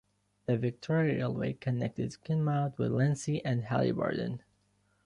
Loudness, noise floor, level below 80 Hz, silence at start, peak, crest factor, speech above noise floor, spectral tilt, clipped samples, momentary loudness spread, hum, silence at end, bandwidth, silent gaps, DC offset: -32 LUFS; -72 dBFS; -64 dBFS; 0.5 s; -16 dBFS; 16 dB; 41 dB; -7.5 dB/octave; under 0.1%; 7 LU; none; 0.7 s; 11 kHz; none; under 0.1%